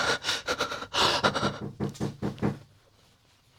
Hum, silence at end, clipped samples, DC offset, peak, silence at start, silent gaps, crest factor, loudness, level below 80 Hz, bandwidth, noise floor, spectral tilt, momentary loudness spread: none; 0.95 s; under 0.1%; under 0.1%; -8 dBFS; 0 s; none; 22 dB; -28 LUFS; -56 dBFS; 17 kHz; -62 dBFS; -3.5 dB/octave; 11 LU